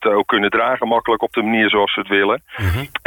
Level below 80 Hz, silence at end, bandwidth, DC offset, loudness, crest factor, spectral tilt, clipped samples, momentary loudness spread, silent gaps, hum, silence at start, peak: -40 dBFS; 0.1 s; 19 kHz; under 0.1%; -17 LUFS; 14 dB; -6 dB/octave; under 0.1%; 6 LU; none; none; 0 s; -2 dBFS